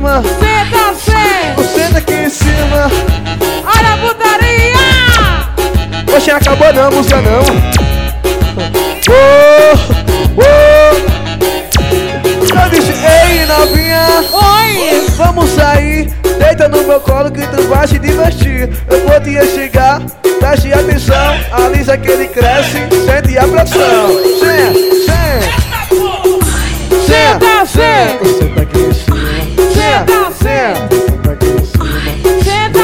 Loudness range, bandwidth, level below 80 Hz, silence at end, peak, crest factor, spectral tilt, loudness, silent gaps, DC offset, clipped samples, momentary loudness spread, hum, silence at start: 3 LU; 17 kHz; -16 dBFS; 0 s; 0 dBFS; 8 dB; -5 dB/octave; -8 LUFS; none; under 0.1%; 1%; 7 LU; none; 0 s